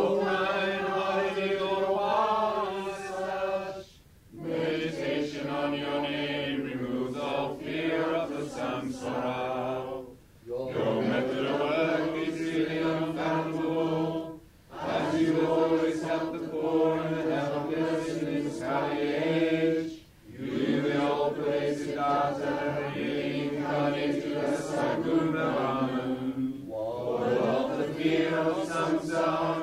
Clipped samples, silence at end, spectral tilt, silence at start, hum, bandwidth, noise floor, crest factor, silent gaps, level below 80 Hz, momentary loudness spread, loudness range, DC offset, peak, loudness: under 0.1%; 0 s; -6 dB/octave; 0 s; none; 15 kHz; -55 dBFS; 16 dB; none; -62 dBFS; 7 LU; 3 LU; under 0.1%; -14 dBFS; -29 LUFS